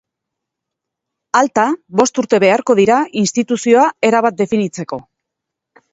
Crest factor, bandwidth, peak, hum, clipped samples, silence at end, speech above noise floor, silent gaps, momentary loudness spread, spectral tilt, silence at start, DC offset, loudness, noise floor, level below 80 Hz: 16 dB; 8 kHz; 0 dBFS; none; under 0.1%; 0.9 s; 67 dB; none; 7 LU; -4.5 dB/octave; 1.35 s; under 0.1%; -14 LUFS; -80 dBFS; -58 dBFS